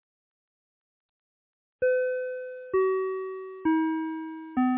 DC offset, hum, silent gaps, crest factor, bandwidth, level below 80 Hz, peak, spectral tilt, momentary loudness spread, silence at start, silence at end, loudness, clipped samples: under 0.1%; none; none; 14 dB; 3.8 kHz; -68 dBFS; -16 dBFS; -4.5 dB/octave; 10 LU; 1.8 s; 0 s; -29 LUFS; under 0.1%